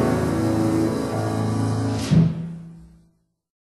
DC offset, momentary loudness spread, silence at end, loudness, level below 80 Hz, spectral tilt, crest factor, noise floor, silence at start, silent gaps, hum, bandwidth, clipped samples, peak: under 0.1%; 14 LU; 0.8 s; -22 LUFS; -44 dBFS; -7.5 dB/octave; 16 dB; -63 dBFS; 0 s; none; none; 12.5 kHz; under 0.1%; -6 dBFS